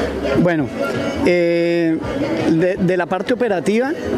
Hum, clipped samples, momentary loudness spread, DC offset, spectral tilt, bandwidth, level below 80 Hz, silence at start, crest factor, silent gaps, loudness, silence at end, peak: none; under 0.1%; 5 LU; under 0.1%; -7 dB/octave; 13.5 kHz; -40 dBFS; 0 s; 16 dB; none; -18 LUFS; 0 s; -2 dBFS